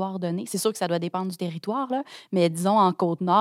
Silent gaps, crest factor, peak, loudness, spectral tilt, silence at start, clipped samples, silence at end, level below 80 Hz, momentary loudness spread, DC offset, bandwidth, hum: none; 16 dB; -8 dBFS; -25 LUFS; -5.5 dB/octave; 0 s; under 0.1%; 0 s; -80 dBFS; 9 LU; under 0.1%; 16 kHz; none